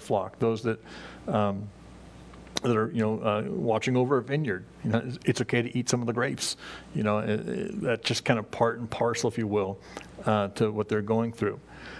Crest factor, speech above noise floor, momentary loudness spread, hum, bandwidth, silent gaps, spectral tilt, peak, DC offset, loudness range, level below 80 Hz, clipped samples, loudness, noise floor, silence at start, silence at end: 24 dB; 19 dB; 11 LU; none; 11 kHz; none; -5.5 dB/octave; -6 dBFS; under 0.1%; 2 LU; -58 dBFS; under 0.1%; -28 LUFS; -47 dBFS; 0 s; 0 s